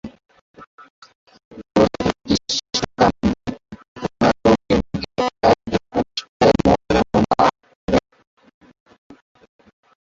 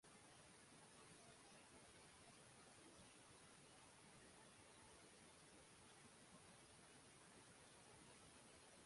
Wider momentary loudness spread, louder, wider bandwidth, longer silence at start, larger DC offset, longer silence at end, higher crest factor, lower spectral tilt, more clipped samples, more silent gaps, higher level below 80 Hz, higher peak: first, 13 LU vs 1 LU; first, -19 LUFS vs -66 LUFS; second, 7.8 kHz vs 11.5 kHz; about the same, 0.05 s vs 0.05 s; neither; first, 2.1 s vs 0 s; about the same, 18 dB vs 14 dB; first, -5.5 dB/octave vs -2.5 dB/octave; neither; first, 0.41-0.54 s, 0.67-0.78 s, 0.90-1.02 s, 1.15-1.26 s, 1.45-1.51 s, 3.88-3.96 s, 6.29-6.40 s, 7.75-7.88 s vs none; first, -40 dBFS vs -84 dBFS; first, -2 dBFS vs -52 dBFS